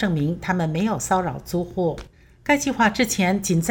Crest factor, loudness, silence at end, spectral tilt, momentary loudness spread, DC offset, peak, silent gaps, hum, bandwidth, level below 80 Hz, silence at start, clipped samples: 18 dB; -22 LUFS; 0 s; -5 dB/octave; 8 LU; under 0.1%; -4 dBFS; none; none; over 20 kHz; -46 dBFS; 0 s; under 0.1%